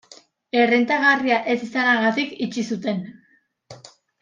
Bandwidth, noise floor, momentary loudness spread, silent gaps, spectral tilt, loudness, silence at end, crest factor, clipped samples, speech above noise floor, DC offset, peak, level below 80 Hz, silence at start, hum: 7.6 kHz; -62 dBFS; 10 LU; none; -5 dB/octave; -20 LUFS; 0.45 s; 18 dB; under 0.1%; 42 dB; under 0.1%; -4 dBFS; -70 dBFS; 0.1 s; none